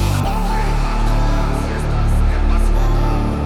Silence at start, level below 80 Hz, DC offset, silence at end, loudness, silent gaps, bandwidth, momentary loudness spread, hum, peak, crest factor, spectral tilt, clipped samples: 0 s; -16 dBFS; under 0.1%; 0 s; -19 LUFS; none; 13.5 kHz; 2 LU; none; -6 dBFS; 10 dB; -6.5 dB/octave; under 0.1%